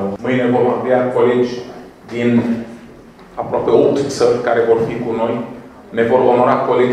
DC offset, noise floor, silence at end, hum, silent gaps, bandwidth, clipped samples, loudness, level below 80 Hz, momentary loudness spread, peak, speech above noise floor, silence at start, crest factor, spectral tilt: under 0.1%; -39 dBFS; 0 s; none; none; 11 kHz; under 0.1%; -15 LUFS; -52 dBFS; 16 LU; 0 dBFS; 25 dB; 0 s; 16 dB; -6.5 dB/octave